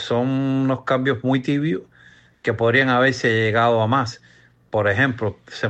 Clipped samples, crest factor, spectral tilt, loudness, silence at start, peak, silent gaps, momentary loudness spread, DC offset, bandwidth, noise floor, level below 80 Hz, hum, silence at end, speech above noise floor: under 0.1%; 16 dB; -6.5 dB/octave; -20 LUFS; 0 s; -4 dBFS; none; 10 LU; under 0.1%; 8.4 kHz; -51 dBFS; -58 dBFS; none; 0 s; 31 dB